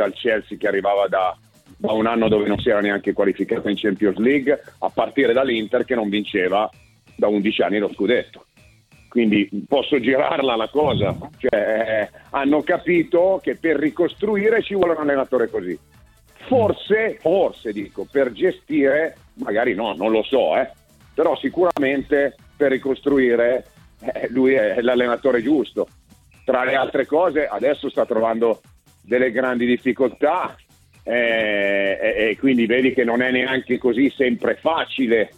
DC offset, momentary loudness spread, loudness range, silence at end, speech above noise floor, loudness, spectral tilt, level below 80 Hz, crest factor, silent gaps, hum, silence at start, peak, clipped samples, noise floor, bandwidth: under 0.1%; 7 LU; 2 LU; 0.1 s; 33 dB; -20 LUFS; -7 dB/octave; -52 dBFS; 16 dB; none; none; 0 s; -4 dBFS; under 0.1%; -53 dBFS; 12.5 kHz